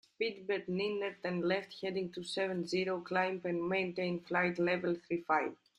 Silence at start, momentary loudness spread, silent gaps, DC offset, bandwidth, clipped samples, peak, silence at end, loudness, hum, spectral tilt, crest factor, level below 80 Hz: 0.2 s; 5 LU; none; under 0.1%; 11 kHz; under 0.1%; -18 dBFS; 0.25 s; -35 LUFS; none; -6 dB/octave; 18 dB; -76 dBFS